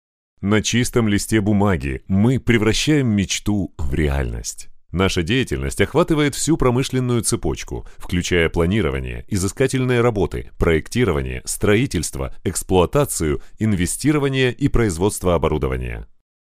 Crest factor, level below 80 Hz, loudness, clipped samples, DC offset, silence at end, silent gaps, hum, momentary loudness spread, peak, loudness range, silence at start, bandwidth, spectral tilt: 18 dB; -32 dBFS; -19 LUFS; under 0.1%; under 0.1%; 0.55 s; none; none; 9 LU; 0 dBFS; 2 LU; 0.4 s; 16 kHz; -5 dB/octave